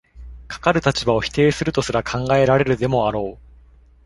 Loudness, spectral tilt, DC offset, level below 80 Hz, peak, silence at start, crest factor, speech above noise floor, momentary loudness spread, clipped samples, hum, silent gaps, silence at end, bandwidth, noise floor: -19 LUFS; -5.5 dB/octave; under 0.1%; -40 dBFS; -2 dBFS; 0.15 s; 18 dB; 30 dB; 6 LU; under 0.1%; none; none; 0.7 s; 11.5 kHz; -49 dBFS